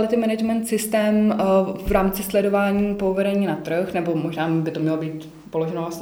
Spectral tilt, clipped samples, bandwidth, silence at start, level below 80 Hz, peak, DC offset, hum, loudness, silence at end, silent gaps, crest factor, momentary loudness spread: -6 dB/octave; under 0.1%; over 20 kHz; 0 s; -42 dBFS; -6 dBFS; under 0.1%; none; -22 LUFS; 0 s; none; 14 dB; 7 LU